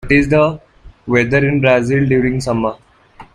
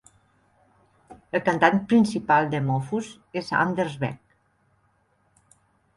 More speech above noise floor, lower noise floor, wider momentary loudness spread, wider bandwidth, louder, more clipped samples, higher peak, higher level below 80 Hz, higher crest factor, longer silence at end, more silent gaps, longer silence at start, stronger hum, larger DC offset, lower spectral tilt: second, 28 dB vs 44 dB; second, -42 dBFS vs -66 dBFS; second, 8 LU vs 12 LU; about the same, 11 kHz vs 11.5 kHz; first, -14 LUFS vs -24 LUFS; neither; first, 0 dBFS vs -4 dBFS; first, -36 dBFS vs -62 dBFS; second, 14 dB vs 22 dB; second, 0.1 s vs 1.8 s; neither; second, 0.05 s vs 1.1 s; neither; neither; about the same, -7 dB/octave vs -6.5 dB/octave